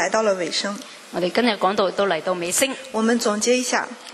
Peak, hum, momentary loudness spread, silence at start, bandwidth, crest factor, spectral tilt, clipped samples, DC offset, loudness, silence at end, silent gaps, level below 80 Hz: -4 dBFS; none; 6 LU; 0 s; 13.5 kHz; 18 dB; -2.5 dB/octave; under 0.1%; under 0.1%; -21 LUFS; 0 s; none; -68 dBFS